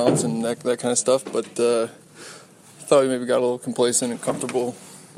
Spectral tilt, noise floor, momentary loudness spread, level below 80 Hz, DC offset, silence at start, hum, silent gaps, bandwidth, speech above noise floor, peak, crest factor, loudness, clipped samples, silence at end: -4 dB/octave; -46 dBFS; 21 LU; -70 dBFS; under 0.1%; 0 s; none; none; 15 kHz; 24 dB; -4 dBFS; 20 dB; -22 LUFS; under 0.1%; 0.1 s